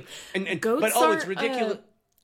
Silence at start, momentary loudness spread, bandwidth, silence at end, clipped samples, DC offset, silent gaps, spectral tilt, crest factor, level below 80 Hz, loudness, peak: 0 s; 11 LU; 17 kHz; 0.45 s; under 0.1%; under 0.1%; none; -3.5 dB/octave; 16 dB; -70 dBFS; -25 LUFS; -10 dBFS